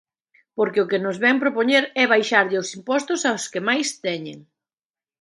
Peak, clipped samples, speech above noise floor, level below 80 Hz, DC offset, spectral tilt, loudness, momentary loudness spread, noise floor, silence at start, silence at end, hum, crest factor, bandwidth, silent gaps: -2 dBFS; under 0.1%; over 69 dB; -74 dBFS; under 0.1%; -3 dB/octave; -20 LUFS; 10 LU; under -90 dBFS; 0.55 s; 0.8 s; none; 22 dB; 11.5 kHz; none